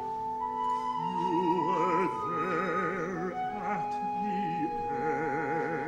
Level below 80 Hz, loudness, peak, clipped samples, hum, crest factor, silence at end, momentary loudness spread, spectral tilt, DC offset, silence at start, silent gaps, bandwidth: -60 dBFS; -31 LUFS; -16 dBFS; under 0.1%; none; 14 dB; 0 s; 6 LU; -6.5 dB/octave; under 0.1%; 0 s; none; 12 kHz